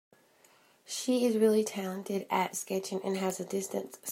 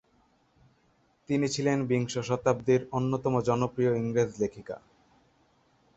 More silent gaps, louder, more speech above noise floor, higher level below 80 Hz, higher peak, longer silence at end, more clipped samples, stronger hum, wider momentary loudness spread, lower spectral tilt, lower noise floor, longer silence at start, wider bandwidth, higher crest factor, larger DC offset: neither; second, -31 LUFS vs -28 LUFS; second, 32 dB vs 40 dB; second, -82 dBFS vs -62 dBFS; second, -14 dBFS vs -10 dBFS; second, 0 s vs 1.2 s; neither; neither; first, 11 LU vs 7 LU; second, -4.5 dB/octave vs -6.5 dB/octave; second, -64 dBFS vs -68 dBFS; second, 0.9 s vs 1.3 s; first, 16 kHz vs 8.2 kHz; about the same, 18 dB vs 20 dB; neither